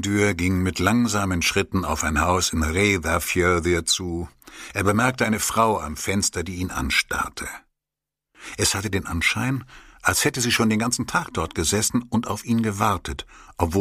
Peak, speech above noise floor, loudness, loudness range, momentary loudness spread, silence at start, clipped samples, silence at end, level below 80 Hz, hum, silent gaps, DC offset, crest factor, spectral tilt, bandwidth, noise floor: 0 dBFS; 65 dB; -22 LUFS; 4 LU; 10 LU; 0 s; under 0.1%; 0 s; -40 dBFS; none; none; under 0.1%; 22 dB; -4 dB/octave; 15.5 kHz; -87 dBFS